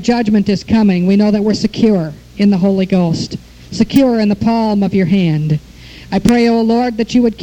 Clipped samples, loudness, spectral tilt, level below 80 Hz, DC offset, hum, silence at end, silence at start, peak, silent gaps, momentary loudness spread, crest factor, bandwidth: under 0.1%; -13 LUFS; -7 dB/octave; -38 dBFS; under 0.1%; none; 0 s; 0 s; 0 dBFS; none; 8 LU; 12 dB; 17 kHz